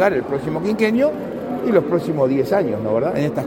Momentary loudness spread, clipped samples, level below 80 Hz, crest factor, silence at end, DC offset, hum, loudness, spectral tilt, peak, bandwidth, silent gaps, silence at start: 6 LU; under 0.1%; -52 dBFS; 16 dB; 0 s; under 0.1%; none; -19 LUFS; -7.5 dB/octave; -4 dBFS; 16.5 kHz; none; 0 s